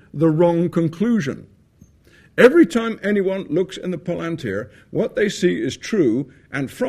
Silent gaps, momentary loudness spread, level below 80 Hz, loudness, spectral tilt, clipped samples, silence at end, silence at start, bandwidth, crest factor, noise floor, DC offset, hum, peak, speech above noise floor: none; 13 LU; -56 dBFS; -20 LUFS; -6.5 dB/octave; under 0.1%; 0 s; 0.15 s; 13.5 kHz; 20 dB; -52 dBFS; under 0.1%; none; 0 dBFS; 33 dB